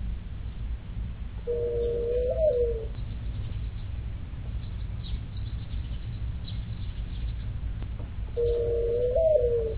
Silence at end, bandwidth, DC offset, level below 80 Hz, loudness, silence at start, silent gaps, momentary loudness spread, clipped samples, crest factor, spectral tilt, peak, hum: 0 s; 4 kHz; under 0.1%; -34 dBFS; -31 LUFS; 0 s; none; 12 LU; under 0.1%; 18 dB; -11 dB/octave; -12 dBFS; none